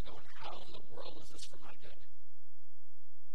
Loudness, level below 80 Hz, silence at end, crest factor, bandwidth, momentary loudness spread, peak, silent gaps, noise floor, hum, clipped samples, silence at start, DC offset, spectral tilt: -52 LUFS; -68 dBFS; 0 s; 20 dB; 16.5 kHz; 11 LU; -24 dBFS; none; -75 dBFS; none; under 0.1%; 0 s; 5%; -4.5 dB/octave